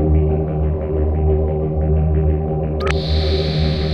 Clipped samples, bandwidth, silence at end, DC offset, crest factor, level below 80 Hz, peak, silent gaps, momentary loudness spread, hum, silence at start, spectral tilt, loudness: under 0.1%; 6.4 kHz; 0 s; under 0.1%; 12 dB; -20 dBFS; -6 dBFS; none; 3 LU; none; 0 s; -8 dB/octave; -18 LUFS